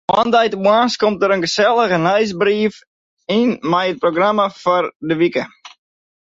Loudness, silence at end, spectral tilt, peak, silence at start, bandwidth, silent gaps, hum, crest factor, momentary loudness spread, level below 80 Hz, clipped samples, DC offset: -16 LUFS; 0.65 s; -5 dB/octave; -2 dBFS; 0.1 s; 7.8 kHz; 2.87-3.17 s, 4.95-5.00 s; none; 14 dB; 6 LU; -58 dBFS; under 0.1%; under 0.1%